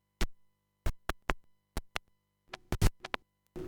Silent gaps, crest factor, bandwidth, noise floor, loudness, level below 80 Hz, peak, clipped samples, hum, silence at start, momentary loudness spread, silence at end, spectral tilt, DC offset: none; 28 dB; 19 kHz; -72 dBFS; -39 LUFS; -40 dBFS; -10 dBFS; under 0.1%; 50 Hz at -60 dBFS; 0.2 s; 15 LU; 0 s; -4.5 dB/octave; under 0.1%